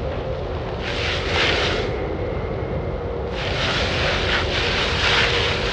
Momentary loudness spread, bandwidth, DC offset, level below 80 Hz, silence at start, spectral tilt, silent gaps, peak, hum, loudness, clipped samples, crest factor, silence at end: 10 LU; 9.8 kHz; under 0.1%; -32 dBFS; 0 s; -4.5 dB/octave; none; -8 dBFS; none; -21 LUFS; under 0.1%; 14 dB; 0 s